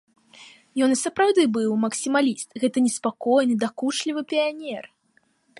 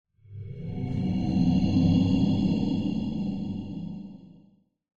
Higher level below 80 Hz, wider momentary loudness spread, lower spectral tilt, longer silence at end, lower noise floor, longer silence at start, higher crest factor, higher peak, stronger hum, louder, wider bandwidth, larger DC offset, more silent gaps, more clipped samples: second, -74 dBFS vs -44 dBFS; second, 7 LU vs 19 LU; second, -3.5 dB/octave vs -8.5 dB/octave; about the same, 0.75 s vs 0.7 s; first, -65 dBFS vs -61 dBFS; about the same, 0.4 s vs 0.3 s; about the same, 16 dB vs 16 dB; about the same, -8 dBFS vs -10 dBFS; neither; first, -23 LUFS vs -26 LUFS; first, 11.5 kHz vs 7.2 kHz; neither; neither; neither